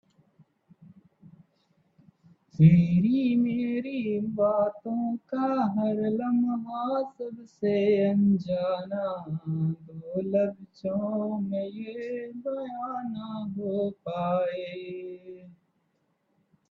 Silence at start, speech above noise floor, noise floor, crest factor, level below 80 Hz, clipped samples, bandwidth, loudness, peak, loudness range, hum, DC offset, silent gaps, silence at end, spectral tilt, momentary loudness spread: 0.8 s; 46 dB; -73 dBFS; 22 dB; -64 dBFS; under 0.1%; 4.9 kHz; -28 LUFS; -8 dBFS; 8 LU; none; under 0.1%; none; 1.2 s; -10.5 dB/octave; 13 LU